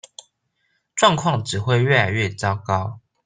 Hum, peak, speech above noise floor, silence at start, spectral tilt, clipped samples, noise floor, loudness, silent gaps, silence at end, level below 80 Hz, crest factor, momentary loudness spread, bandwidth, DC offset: none; 0 dBFS; 51 dB; 0.95 s; -4.5 dB/octave; under 0.1%; -70 dBFS; -20 LUFS; none; 0.3 s; -58 dBFS; 20 dB; 8 LU; 9.6 kHz; under 0.1%